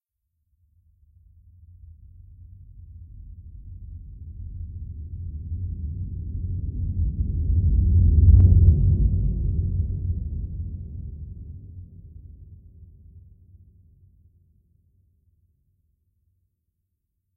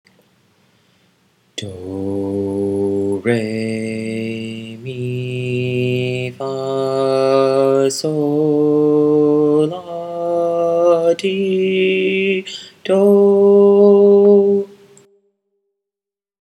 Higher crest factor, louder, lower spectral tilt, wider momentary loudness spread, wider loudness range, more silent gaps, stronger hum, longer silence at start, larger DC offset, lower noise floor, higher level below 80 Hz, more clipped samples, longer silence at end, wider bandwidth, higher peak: about the same, 20 dB vs 16 dB; second, -23 LUFS vs -15 LUFS; first, -15.5 dB/octave vs -6.5 dB/octave; first, 28 LU vs 16 LU; first, 24 LU vs 9 LU; neither; neither; first, 2.75 s vs 1.55 s; neither; second, -77 dBFS vs -88 dBFS; first, -28 dBFS vs -68 dBFS; neither; first, 4.2 s vs 1.75 s; second, 0.8 kHz vs 11.5 kHz; second, -4 dBFS vs 0 dBFS